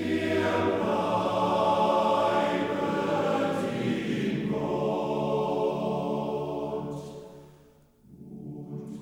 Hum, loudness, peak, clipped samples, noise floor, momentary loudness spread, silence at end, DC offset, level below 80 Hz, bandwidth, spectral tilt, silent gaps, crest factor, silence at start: none; -27 LUFS; -12 dBFS; under 0.1%; -58 dBFS; 15 LU; 0 s; under 0.1%; -60 dBFS; 17 kHz; -6.5 dB/octave; none; 16 dB; 0 s